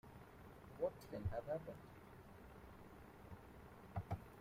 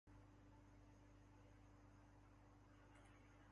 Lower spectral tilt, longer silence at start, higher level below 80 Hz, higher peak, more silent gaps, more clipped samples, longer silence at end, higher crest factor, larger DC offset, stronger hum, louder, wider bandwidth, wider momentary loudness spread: first, -7.5 dB/octave vs -6 dB/octave; about the same, 0.05 s vs 0.05 s; first, -64 dBFS vs -72 dBFS; first, -30 dBFS vs -56 dBFS; neither; neither; about the same, 0 s vs 0 s; first, 20 dB vs 12 dB; neither; second, none vs 50 Hz at -70 dBFS; first, -52 LUFS vs -69 LUFS; first, 16 kHz vs 7.6 kHz; first, 14 LU vs 1 LU